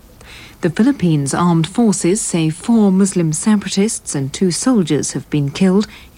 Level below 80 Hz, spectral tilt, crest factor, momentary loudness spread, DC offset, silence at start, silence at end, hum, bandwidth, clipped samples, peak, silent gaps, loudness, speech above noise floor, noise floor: -46 dBFS; -5.5 dB/octave; 12 dB; 6 LU; under 0.1%; 0.25 s; 0.15 s; none; 15.5 kHz; under 0.1%; -4 dBFS; none; -15 LUFS; 23 dB; -38 dBFS